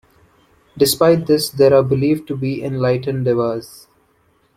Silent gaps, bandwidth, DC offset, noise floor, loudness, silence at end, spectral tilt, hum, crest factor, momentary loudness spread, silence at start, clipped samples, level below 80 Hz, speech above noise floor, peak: none; 16.5 kHz; under 0.1%; -59 dBFS; -16 LUFS; 0.9 s; -5.5 dB/octave; none; 16 dB; 9 LU; 0.75 s; under 0.1%; -52 dBFS; 43 dB; -2 dBFS